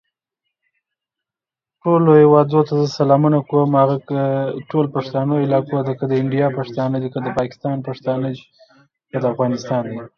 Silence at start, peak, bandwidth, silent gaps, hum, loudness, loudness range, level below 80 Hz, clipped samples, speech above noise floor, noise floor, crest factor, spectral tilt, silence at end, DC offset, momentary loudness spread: 1.85 s; 0 dBFS; 7 kHz; none; none; -18 LUFS; 7 LU; -60 dBFS; under 0.1%; 72 dB; -89 dBFS; 18 dB; -8.5 dB/octave; 0.1 s; under 0.1%; 11 LU